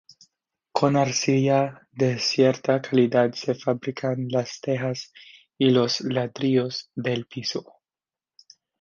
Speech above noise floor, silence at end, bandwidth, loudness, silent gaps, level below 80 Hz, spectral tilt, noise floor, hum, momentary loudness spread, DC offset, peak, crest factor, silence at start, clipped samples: over 67 dB; 1.2 s; 7.4 kHz; -24 LUFS; none; -68 dBFS; -5.5 dB/octave; under -90 dBFS; none; 10 LU; under 0.1%; -4 dBFS; 20 dB; 0.75 s; under 0.1%